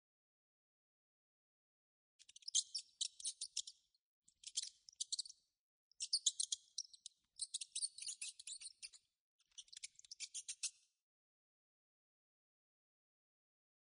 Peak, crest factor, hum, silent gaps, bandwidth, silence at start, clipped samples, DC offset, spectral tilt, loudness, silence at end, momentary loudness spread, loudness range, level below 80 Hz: -20 dBFS; 30 dB; none; 3.99-4.22 s, 5.59-5.91 s, 9.20-9.39 s; 10 kHz; 2.45 s; under 0.1%; under 0.1%; 6.5 dB/octave; -44 LUFS; 3.1 s; 18 LU; 9 LU; under -90 dBFS